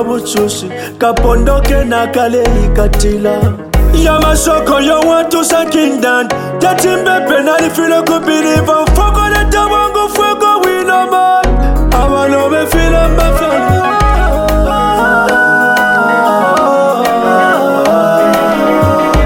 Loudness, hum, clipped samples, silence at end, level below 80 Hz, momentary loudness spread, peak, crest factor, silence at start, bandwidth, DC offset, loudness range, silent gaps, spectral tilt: -10 LUFS; none; under 0.1%; 0 s; -16 dBFS; 3 LU; 0 dBFS; 10 dB; 0 s; 17 kHz; under 0.1%; 2 LU; none; -5 dB/octave